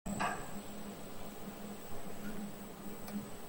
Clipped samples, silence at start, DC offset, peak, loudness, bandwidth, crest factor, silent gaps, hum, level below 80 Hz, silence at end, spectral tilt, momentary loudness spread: under 0.1%; 0.05 s; under 0.1%; -22 dBFS; -45 LUFS; 17 kHz; 18 dB; none; none; -56 dBFS; 0 s; -4.5 dB/octave; 9 LU